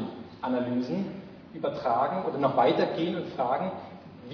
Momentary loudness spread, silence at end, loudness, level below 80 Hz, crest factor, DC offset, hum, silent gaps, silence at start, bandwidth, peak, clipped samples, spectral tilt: 18 LU; 0 s; -29 LUFS; -68 dBFS; 18 dB; under 0.1%; none; none; 0 s; 5.4 kHz; -12 dBFS; under 0.1%; -8 dB/octave